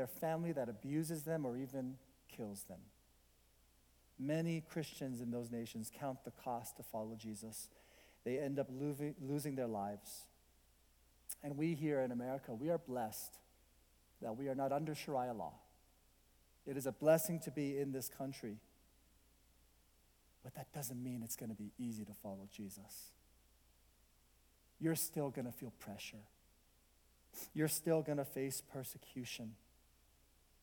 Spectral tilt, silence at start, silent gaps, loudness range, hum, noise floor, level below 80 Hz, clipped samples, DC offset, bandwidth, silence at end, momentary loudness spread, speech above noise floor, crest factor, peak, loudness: -5.5 dB/octave; 0 s; none; 8 LU; none; -72 dBFS; -74 dBFS; under 0.1%; under 0.1%; 19 kHz; 1.05 s; 14 LU; 30 dB; 24 dB; -20 dBFS; -43 LUFS